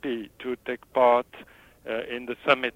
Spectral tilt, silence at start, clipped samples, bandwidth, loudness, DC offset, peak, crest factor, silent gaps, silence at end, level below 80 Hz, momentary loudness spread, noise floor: -5 dB/octave; 0.05 s; under 0.1%; 16 kHz; -26 LUFS; under 0.1%; -4 dBFS; 24 dB; none; 0.05 s; -64 dBFS; 13 LU; -50 dBFS